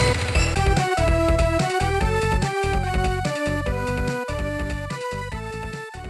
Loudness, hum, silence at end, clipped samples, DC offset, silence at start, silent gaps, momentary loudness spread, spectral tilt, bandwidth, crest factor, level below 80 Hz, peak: -23 LUFS; none; 0 s; under 0.1%; under 0.1%; 0 s; none; 10 LU; -5.5 dB/octave; 13 kHz; 16 dB; -28 dBFS; -6 dBFS